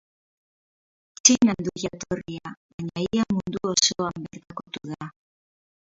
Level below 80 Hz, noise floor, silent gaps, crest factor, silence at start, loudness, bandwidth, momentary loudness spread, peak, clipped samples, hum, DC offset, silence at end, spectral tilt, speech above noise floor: -58 dBFS; under -90 dBFS; 2.57-2.79 s; 26 dB; 1.25 s; -23 LUFS; 7.8 kHz; 20 LU; 0 dBFS; under 0.1%; none; under 0.1%; 0.85 s; -3 dB/octave; over 64 dB